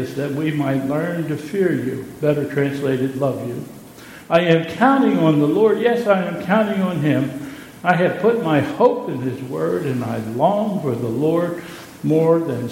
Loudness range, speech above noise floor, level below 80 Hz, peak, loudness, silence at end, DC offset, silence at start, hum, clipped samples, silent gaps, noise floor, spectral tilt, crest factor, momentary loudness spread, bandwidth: 4 LU; 21 dB; -58 dBFS; 0 dBFS; -19 LUFS; 0 s; under 0.1%; 0 s; none; under 0.1%; none; -39 dBFS; -7.5 dB/octave; 18 dB; 11 LU; 16.5 kHz